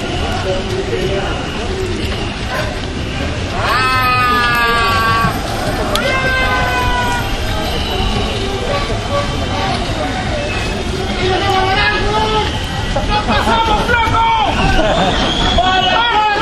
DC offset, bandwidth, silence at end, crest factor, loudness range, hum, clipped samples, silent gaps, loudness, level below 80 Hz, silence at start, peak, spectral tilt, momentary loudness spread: under 0.1%; 13.5 kHz; 0 s; 14 dB; 4 LU; none; under 0.1%; none; -15 LUFS; -24 dBFS; 0 s; 0 dBFS; -4.5 dB/octave; 7 LU